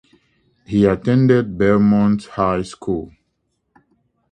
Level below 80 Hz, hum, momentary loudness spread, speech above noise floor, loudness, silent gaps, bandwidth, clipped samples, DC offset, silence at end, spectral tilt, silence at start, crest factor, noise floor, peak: -44 dBFS; none; 11 LU; 54 dB; -17 LUFS; none; 9.4 kHz; under 0.1%; under 0.1%; 1.25 s; -8.5 dB/octave; 0.7 s; 18 dB; -70 dBFS; -2 dBFS